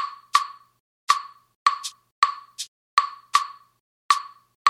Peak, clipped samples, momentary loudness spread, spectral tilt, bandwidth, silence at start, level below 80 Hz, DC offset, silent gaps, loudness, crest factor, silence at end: -2 dBFS; under 0.1%; 12 LU; 3.5 dB/octave; 15 kHz; 0 s; -84 dBFS; under 0.1%; 0.80-1.07 s, 1.55-1.66 s, 2.11-2.22 s, 2.68-2.97 s, 3.80-4.09 s, 4.55-4.65 s; -24 LUFS; 24 dB; 0 s